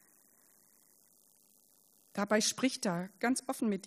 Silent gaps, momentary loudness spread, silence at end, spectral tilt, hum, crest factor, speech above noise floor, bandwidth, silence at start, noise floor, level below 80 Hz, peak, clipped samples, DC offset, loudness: none; 8 LU; 0 s; -3.5 dB/octave; none; 22 dB; 34 dB; 15.5 kHz; 2.15 s; -67 dBFS; -82 dBFS; -14 dBFS; under 0.1%; under 0.1%; -33 LUFS